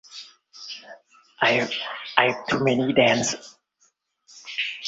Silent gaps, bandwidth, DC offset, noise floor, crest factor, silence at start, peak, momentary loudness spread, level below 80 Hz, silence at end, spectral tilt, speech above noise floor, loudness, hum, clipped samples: none; 8.2 kHz; under 0.1%; -66 dBFS; 24 dB; 0.1 s; 0 dBFS; 22 LU; -64 dBFS; 0 s; -3.5 dB/octave; 45 dB; -22 LUFS; none; under 0.1%